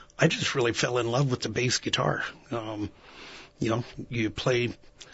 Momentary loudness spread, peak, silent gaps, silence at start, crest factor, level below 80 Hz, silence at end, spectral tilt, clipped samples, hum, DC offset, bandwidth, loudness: 15 LU; -8 dBFS; none; 0 s; 22 dB; -56 dBFS; 0.1 s; -4.5 dB/octave; under 0.1%; none; under 0.1%; 8 kHz; -28 LUFS